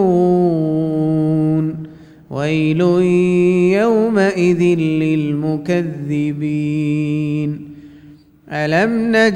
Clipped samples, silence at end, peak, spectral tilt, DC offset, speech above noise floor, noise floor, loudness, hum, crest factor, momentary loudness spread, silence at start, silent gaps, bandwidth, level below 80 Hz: under 0.1%; 0 s; -2 dBFS; -7.5 dB/octave; under 0.1%; 28 dB; -43 dBFS; -16 LUFS; none; 14 dB; 9 LU; 0 s; none; 9.8 kHz; -52 dBFS